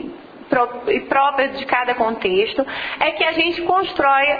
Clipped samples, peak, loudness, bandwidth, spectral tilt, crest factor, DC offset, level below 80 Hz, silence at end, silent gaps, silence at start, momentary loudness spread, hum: under 0.1%; -4 dBFS; -18 LUFS; 5 kHz; -6 dB/octave; 16 dB; under 0.1%; -52 dBFS; 0 s; none; 0 s; 6 LU; none